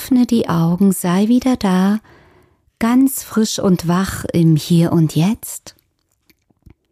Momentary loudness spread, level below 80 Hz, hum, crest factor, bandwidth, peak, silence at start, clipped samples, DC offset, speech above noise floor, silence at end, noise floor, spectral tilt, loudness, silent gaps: 5 LU; -46 dBFS; none; 12 dB; 15.5 kHz; -4 dBFS; 0 s; under 0.1%; under 0.1%; 49 dB; 1.2 s; -64 dBFS; -6 dB/octave; -16 LUFS; none